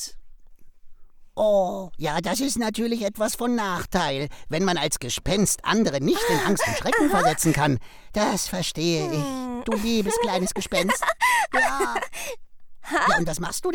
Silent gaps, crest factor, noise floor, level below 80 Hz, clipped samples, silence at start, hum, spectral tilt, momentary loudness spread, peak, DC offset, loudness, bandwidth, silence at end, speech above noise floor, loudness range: none; 18 dB; -44 dBFS; -44 dBFS; under 0.1%; 0 s; none; -4 dB/octave; 9 LU; -6 dBFS; under 0.1%; -23 LUFS; 19 kHz; 0 s; 21 dB; 3 LU